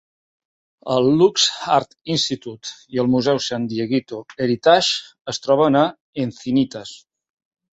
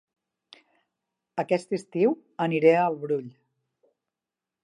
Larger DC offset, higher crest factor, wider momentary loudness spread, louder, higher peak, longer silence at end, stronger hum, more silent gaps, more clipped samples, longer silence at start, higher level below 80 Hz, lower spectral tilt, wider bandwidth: neither; about the same, 20 dB vs 22 dB; about the same, 14 LU vs 12 LU; first, -19 LUFS vs -25 LUFS; first, 0 dBFS vs -6 dBFS; second, 0.8 s vs 1.35 s; neither; first, 5.21-5.25 s, 6.01-6.13 s vs none; neither; second, 0.85 s vs 1.35 s; first, -60 dBFS vs -82 dBFS; second, -4.5 dB/octave vs -7 dB/octave; second, 8.2 kHz vs 10.5 kHz